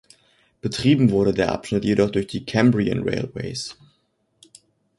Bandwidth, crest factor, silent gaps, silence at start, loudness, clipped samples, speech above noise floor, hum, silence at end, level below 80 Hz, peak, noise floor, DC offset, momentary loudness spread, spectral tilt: 11.5 kHz; 18 dB; none; 0.65 s; -21 LUFS; under 0.1%; 48 dB; none; 1.25 s; -48 dBFS; -4 dBFS; -68 dBFS; under 0.1%; 12 LU; -6.5 dB/octave